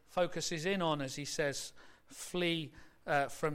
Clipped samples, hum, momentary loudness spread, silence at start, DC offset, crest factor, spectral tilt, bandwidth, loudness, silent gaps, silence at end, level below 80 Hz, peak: under 0.1%; none; 14 LU; 0.1 s; under 0.1%; 18 dB; -4 dB/octave; 16 kHz; -36 LUFS; none; 0 s; -62 dBFS; -18 dBFS